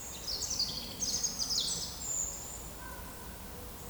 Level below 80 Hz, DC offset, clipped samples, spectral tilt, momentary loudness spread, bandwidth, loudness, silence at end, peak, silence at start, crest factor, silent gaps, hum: -52 dBFS; under 0.1%; under 0.1%; -1 dB/octave; 13 LU; over 20 kHz; -34 LUFS; 0 s; -20 dBFS; 0 s; 18 dB; none; none